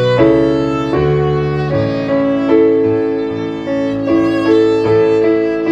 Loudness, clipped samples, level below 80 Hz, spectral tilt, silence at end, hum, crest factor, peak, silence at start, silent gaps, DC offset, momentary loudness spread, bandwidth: -13 LUFS; under 0.1%; -38 dBFS; -8 dB/octave; 0 s; none; 12 dB; 0 dBFS; 0 s; none; under 0.1%; 7 LU; 8 kHz